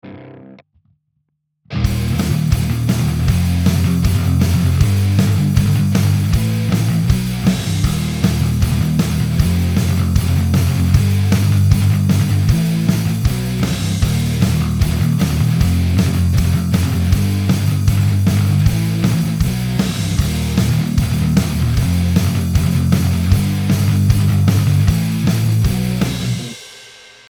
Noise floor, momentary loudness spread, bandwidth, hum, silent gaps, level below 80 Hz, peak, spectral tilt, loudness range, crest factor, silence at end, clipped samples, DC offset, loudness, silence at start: -69 dBFS; 4 LU; over 20 kHz; none; none; -26 dBFS; 0 dBFS; -6.5 dB/octave; 2 LU; 14 dB; 0.4 s; under 0.1%; under 0.1%; -16 LUFS; 0.05 s